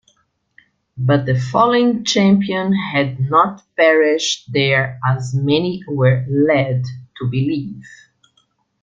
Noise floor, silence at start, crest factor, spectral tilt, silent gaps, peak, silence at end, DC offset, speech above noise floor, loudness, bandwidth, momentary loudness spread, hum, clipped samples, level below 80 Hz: -62 dBFS; 0.95 s; 16 dB; -6 dB/octave; none; -2 dBFS; 0.95 s; under 0.1%; 46 dB; -16 LUFS; 7.6 kHz; 9 LU; none; under 0.1%; -54 dBFS